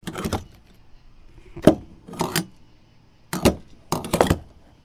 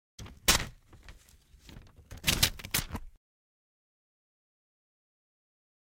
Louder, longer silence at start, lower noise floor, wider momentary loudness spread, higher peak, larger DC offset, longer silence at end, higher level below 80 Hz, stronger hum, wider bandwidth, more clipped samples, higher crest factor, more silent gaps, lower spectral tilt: first, -24 LUFS vs -28 LUFS; second, 0.05 s vs 0.2 s; second, -53 dBFS vs -59 dBFS; about the same, 18 LU vs 18 LU; first, 0 dBFS vs -8 dBFS; neither; second, 0.4 s vs 2.9 s; first, -40 dBFS vs -46 dBFS; neither; first, over 20 kHz vs 16.5 kHz; neither; about the same, 26 dB vs 30 dB; neither; first, -5 dB/octave vs -1.5 dB/octave